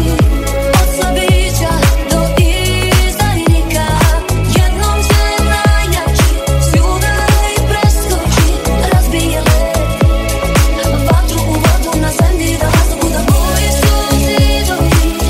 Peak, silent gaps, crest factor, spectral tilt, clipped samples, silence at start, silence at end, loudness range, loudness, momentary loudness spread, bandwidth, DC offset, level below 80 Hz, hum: 0 dBFS; none; 10 dB; -5 dB/octave; under 0.1%; 0 s; 0 s; 1 LU; -12 LUFS; 2 LU; 16.5 kHz; 0.4%; -14 dBFS; none